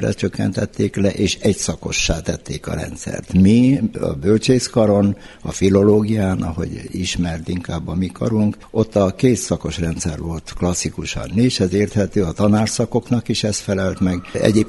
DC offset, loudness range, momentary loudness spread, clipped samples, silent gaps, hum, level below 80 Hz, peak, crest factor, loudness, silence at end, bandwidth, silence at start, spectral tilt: under 0.1%; 4 LU; 11 LU; under 0.1%; none; none; -36 dBFS; 0 dBFS; 18 dB; -19 LUFS; 0 s; 11.5 kHz; 0 s; -5.5 dB/octave